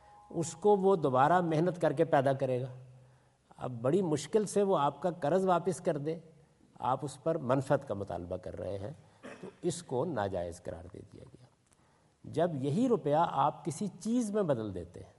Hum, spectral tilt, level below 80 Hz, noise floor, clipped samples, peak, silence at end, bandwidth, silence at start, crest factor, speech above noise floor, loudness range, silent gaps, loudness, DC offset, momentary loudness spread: none; -6.5 dB/octave; -70 dBFS; -68 dBFS; under 0.1%; -14 dBFS; 0.15 s; 11.5 kHz; 0.3 s; 20 dB; 36 dB; 9 LU; none; -32 LUFS; under 0.1%; 16 LU